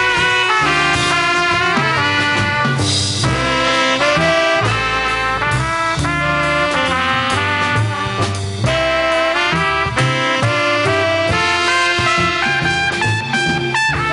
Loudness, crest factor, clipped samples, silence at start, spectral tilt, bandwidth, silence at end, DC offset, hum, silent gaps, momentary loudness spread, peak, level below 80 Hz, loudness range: -15 LUFS; 14 dB; under 0.1%; 0 s; -4 dB/octave; 11.5 kHz; 0 s; under 0.1%; none; none; 3 LU; -2 dBFS; -36 dBFS; 2 LU